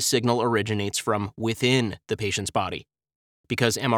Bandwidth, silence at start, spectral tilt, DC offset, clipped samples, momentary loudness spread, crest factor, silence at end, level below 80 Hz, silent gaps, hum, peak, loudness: 18 kHz; 0 s; -4 dB/octave; under 0.1%; under 0.1%; 7 LU; 22 dB; 0 s; -60 dBFS; 3.15-3.44 s; none; -4 dBFS; -25 LUFS